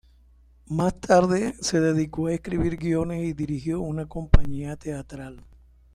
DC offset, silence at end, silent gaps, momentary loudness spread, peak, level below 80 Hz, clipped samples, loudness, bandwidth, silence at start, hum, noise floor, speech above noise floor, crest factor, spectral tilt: under 0.1%; 0.55 s; none; 14 LU; -2 dBFS; -32 dBFS; under 0.1%; -25 LUFS; 11.5 kHz; 0.7 s; none; -55 dBFS; 32 dB; 22 dB; -6 dB/octave